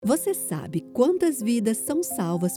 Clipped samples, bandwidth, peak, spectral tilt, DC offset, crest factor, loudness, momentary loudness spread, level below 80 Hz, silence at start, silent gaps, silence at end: under 0.1%; 18.5 kHz; -8 dBFS; -5.5 dB/octave; under 0.1%; 16 dB; -25 LUFS; 7 LU; -66 dBFS; 0 s; none; 0 s